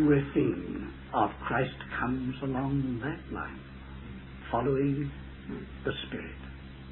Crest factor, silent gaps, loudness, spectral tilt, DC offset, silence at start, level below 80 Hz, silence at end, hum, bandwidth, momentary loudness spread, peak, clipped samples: 20 dB; none; -32 LUFS; -11 dB/octave; under 0.1%; 0 s; -48 dBFS; 0 s; none; 4.2 kHz; 16 LU; -12 dBFS; under 0.1%